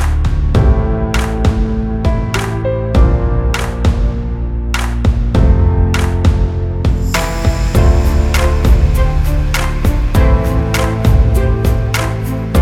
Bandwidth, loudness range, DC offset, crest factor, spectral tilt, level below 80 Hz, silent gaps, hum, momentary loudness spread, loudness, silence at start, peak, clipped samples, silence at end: 16 kHz; 2 LU; under 0.1%; 12 dB; -6.5 dB/octave; -14 dBFS; none; none; 5 LU; -14 LUFS; 0 s; 0 dBFS; under 0.1%; 0 s